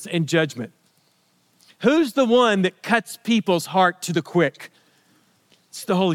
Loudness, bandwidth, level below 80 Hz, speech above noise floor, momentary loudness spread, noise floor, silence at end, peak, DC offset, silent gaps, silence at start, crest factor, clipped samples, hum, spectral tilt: -20 LUFS; 16.5 kHz; -74 dBFS; 43 dB; 17 LU; -63 dBFS; 0 s; -2 dBFS; under 0.1%; none; 0 s; 20 dB; under 0.1%; none; -5 dB/octave